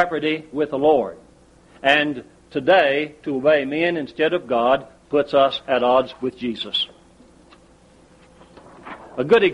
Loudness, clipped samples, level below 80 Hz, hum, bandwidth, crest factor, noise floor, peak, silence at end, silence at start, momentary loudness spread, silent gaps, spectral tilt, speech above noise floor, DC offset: -20 LUFS; under 0.1%; -56 dBFS; none; 10.5 kHz; 18 dB; -51 dBFS; -2 dBFS; 0 s; 0 s; 11 LU; none; -5.5 dB/octave; 32 dB; under 0.1%